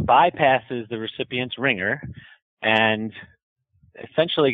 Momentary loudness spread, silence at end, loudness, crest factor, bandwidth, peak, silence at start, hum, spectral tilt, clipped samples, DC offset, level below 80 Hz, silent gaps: 15 LU; 0 s; -22 LUFS; 20 dB; 5.4 kHz; -4 dBFS; 0 s; none; -7.5 dB/octave; under 0.1%; under 0.1%; -56 dBFS; 2.42-2.57 s, 3.43-3.56 s